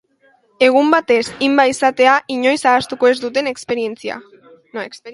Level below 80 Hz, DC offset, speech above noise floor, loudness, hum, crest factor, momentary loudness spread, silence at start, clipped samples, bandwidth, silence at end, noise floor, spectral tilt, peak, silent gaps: -60 dBFS; under 0.1%; 41 dB; -15 LUFS; none; 16 dB; 15 LU; 0.6 s; under 0.1%; 11.5 kHz; 0 s; -56 dBFS; -3 dB/octave; 0 dBFS; none